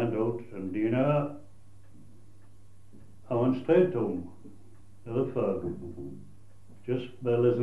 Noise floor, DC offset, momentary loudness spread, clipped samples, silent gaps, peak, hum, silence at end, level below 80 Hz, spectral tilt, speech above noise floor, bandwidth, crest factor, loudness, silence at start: -57 dBFS; 0.5%; 20 LU; under 0.1%; none; -12 dBFS; none; 0 s; -64 dBFS; -9.5 dB/octave; 29 dB; 11 kHz; 20 dB; -29 LUFS; 0 s